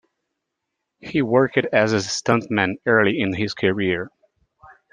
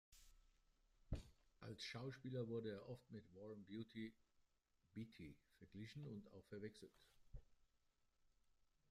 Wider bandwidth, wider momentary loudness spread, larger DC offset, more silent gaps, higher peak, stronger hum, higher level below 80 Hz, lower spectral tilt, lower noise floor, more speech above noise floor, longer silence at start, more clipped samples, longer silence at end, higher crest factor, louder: second, 10 kHz vs 15 kHz; second, 8 LU vs 16 LU; neither; neither; first, -2 dBFS vs -34 dBFS; neither; first, -60 dBFS vs -68 dBFS; second, -5 dB/octave vs -6.5 dB/octave; second, -80 dBFS vs -84 dBFS; first, 60 dB vs 29 dB; first, 1.05 s vs 0.1 s; neither; first, 0.85 s vs 0.6 s; about the same, 20 dB vs 22 dB; first, -20 LUFS vs -55 LUFS